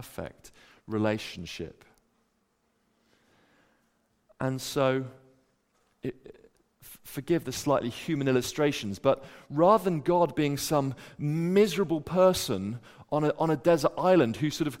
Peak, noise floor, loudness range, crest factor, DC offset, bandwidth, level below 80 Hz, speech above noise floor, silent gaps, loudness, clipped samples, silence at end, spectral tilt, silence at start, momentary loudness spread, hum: -8 dBFS; -73 dBFS; 12 LU; 20 dB; under 0.1%; 16.5 kHz; -60 dBFS; 46 dB; none; -27 LUFS; under 0.1%; 0.05 s; -5.5 dB/octave; 0 s; 16 LU; none